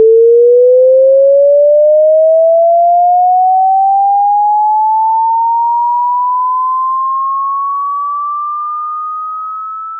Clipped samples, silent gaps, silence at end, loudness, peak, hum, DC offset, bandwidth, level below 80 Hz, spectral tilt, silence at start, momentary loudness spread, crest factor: under 0.1%; none; 0 s; -9 LUFS; -2 dBFS; none; under 0.1%; 1.4 kHz; under -90 dBFS; 2.5 dB/octave; 0 s; 11 LU; 8 dB